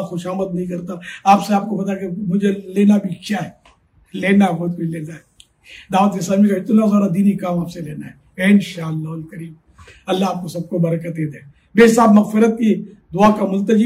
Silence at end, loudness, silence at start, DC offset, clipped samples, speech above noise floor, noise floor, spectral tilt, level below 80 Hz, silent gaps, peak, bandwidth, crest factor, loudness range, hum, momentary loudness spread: 0 s; -17 LUFS; 0 s; under 0.1%; under 0.1%; 36 dB; -52 dBFS; -7 dB/octave; -54 dBFS; none; -2 dBFS; 14 kHz; 16 dB; 5 LU; none; 17 LU